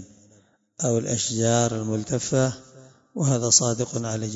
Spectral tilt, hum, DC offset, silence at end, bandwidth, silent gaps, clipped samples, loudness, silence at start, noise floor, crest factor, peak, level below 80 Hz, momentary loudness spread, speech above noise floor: -4 dB/octave; none; under 0.1%; 0 s; 8 kHz; none; under 0.1%; -23 LUFS; 0 s; -59 dBFS; 20 dB; -4 dBFS; -58 dBFS; 10 LU; 36 dB